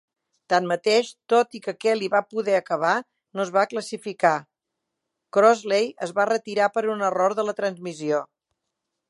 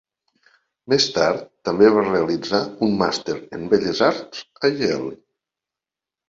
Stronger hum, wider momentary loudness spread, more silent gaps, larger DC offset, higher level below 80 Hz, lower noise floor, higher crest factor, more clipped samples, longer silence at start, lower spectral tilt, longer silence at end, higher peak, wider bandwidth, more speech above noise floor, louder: neither; second, 8 LU vs 12 LU; neither; neither; second, -80 dBFS vs -56 dBFS; second, -82 dBFS vs -89 dBFS; about the same, 20 dB vs 20 dB; neither; second, 0.5 s vs 0.9 s; about the same, -4 dB/octave vs -4.5 dB/octave; second, 0.85 s vs 1.15 s; about the same, -4 dBFS vs -2 dBFS; first, 11.5 kHz vs 7.8 kHz; second, 60 dB vs 69 dB; second, -23 LUFS vs -20 LUFS